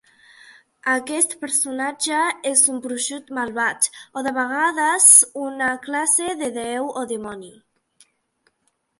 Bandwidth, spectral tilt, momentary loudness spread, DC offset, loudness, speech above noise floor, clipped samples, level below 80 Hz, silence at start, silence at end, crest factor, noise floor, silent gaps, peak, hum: 16 kHz; 0 dB/octave; 15 LU; under 0.1%; -18 LUFS; 49 dB; under 0.1%; -68 dBFS; 0.85 s; 1.5 s; 22 dB; -70 dBFS; none; 0 dBFS; none